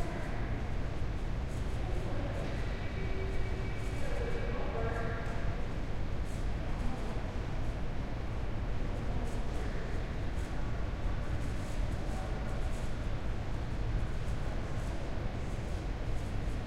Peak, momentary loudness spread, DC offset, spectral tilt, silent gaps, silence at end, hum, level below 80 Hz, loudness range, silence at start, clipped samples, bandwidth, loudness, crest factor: -20 dBFS; 2 LU; under 0.1%; -6.5 dB/octave; none; 0 s; none; -36 dBFS; 1 LU; 0 s; under 0.1%; 11 kHz; -38 LUFS; 12 dB